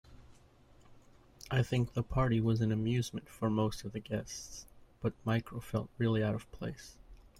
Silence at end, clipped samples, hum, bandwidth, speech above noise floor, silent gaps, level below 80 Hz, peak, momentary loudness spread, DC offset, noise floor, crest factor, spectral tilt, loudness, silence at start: 0.15 s; under 0.1%; none; 13.5 kHz; 28 dB; none; -54 dBFS; -16 dBFS; 13 LU; under 0.1%; -61 dBFS; 18 dB; -6.5 dB/octave; -35 LUFS; 0.1 s